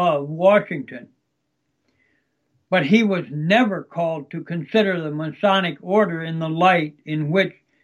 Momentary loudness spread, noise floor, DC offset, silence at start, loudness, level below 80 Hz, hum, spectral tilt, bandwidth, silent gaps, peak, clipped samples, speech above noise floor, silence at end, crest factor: 12 LU; -74 dBFS; under 0.1%; 0 s; -20 LUFS; -74 dBFS; none; -7 dB/octave; 11 kHz; none; -2 dBFS; under 0.1%; 54 dB; 0.35 s; 18 dB